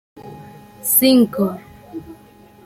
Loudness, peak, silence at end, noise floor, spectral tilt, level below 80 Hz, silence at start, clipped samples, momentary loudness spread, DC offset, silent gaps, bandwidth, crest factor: -15 LUFS; 0 dBFS; 0.5 s; -46 dBFS; -4 dB/octave; -56 dBFS; 0.15 s; under 0.1%; 24 LU; under 0.1%; none; 16 kHz; 20 dB